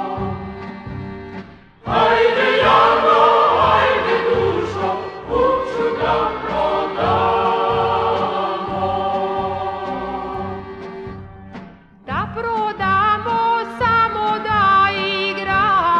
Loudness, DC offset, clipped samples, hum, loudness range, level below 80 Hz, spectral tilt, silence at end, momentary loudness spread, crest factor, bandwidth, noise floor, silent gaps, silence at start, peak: -17 LUFS; under 0.1%; under 0.1%; none; 10 LU; -42 dBFS; -6 dB/octave; 0 s; 18 LU; 16 dB; 9.2 kHz; -40 dBFS; none; 0 s; -2 dBFS